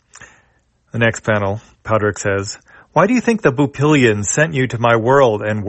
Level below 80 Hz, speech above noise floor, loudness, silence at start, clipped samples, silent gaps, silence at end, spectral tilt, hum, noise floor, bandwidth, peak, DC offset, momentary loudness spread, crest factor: -50 dBFS; 44 dB; -15 LUFS; 0.2 s; under 0.1%; none; 0 s; -5.5 dB/octave; none; -59 dBFS; 8.6 kHz; 0 dBFS; under 0.1%; 10 LU; 16 dB